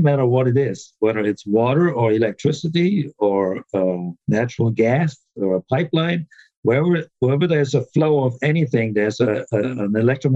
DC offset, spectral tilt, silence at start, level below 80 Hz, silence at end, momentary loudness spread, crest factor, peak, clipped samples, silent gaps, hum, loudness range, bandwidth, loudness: under 0.1%; -7.5 dB/octave; 0 s; -62 dBFS; 0 s; 5 LU; 12 dB; -6 dBFS; under 0.1%; 6.56-6.63 s; none; 2 LU; 8 kHz; -19 LUFS